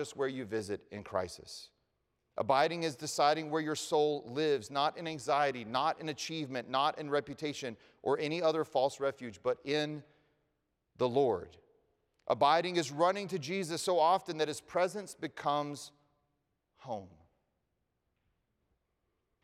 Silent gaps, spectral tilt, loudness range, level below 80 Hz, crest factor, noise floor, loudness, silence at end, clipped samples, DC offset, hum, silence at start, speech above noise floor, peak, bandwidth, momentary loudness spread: none; -4 dB/octave; 8 LU; -76 dBFS; 20 dB; -82 dBFS; -33 LUFS; 2.35 s; under 0.1%; under 0.1%; none; 0 s; 49 dB; -14 dBFS; 15.5 kHz; 13 LU